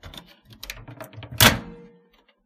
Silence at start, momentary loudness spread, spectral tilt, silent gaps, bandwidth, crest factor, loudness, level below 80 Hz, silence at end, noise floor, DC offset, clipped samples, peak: 0.05 s; 25 LU; -2.5 dB/octave; none; 15.5 kHz; 26 dB; -18 LUFS; -44 dBFS; 0.75 s; -60 dBFS; under 0.1%; under 0.1%; 0 dBFS